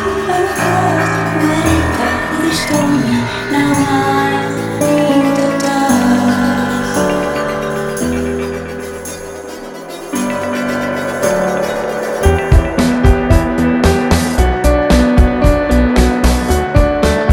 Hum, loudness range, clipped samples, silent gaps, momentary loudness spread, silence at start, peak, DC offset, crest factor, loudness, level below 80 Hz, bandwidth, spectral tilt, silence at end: none; 7 LU; under 0.1%; none; 7 LU; 0 s; 0 dBFS; under 0.1%; 12 dB; -14 LUFS; -20 dBFS; 18 kHz; -5.5 dB/octave; 0 s